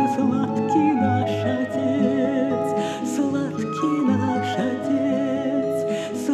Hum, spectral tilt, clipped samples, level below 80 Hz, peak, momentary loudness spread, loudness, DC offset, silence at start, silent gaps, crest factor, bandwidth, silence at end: none; -6.5 dB/octave; under 0.1%; -66 dBFS; -8 dBFS; 5 LU; -22 LUFS; under 0.1%; 0 s; none; 14 dB; 13 kHz; 0 s